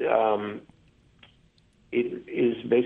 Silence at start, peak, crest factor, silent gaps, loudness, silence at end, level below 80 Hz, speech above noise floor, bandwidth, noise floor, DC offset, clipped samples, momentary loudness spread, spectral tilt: 0 s; -8 dBFS; 18 dB; none; -27 LUFS; 0 s; -66 dBFS; 36 dB; 4 kHz; -61 dBFS; under 0.1%; under 0.1%; 11 LU; -8.5 dB/octave